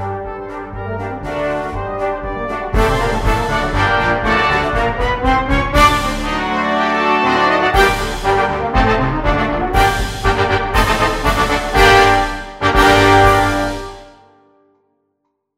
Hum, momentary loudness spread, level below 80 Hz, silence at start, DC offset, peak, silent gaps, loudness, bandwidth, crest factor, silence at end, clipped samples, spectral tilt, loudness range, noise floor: none; 12 LU; -24 dBFS; 0 s; under 0.1%; 0 dBFS; none; -15 LUFS; 16 kHz; 16 dB; 1.5 s; under 0.1%; -5 dB/octave; 5 LU; -70 dBFS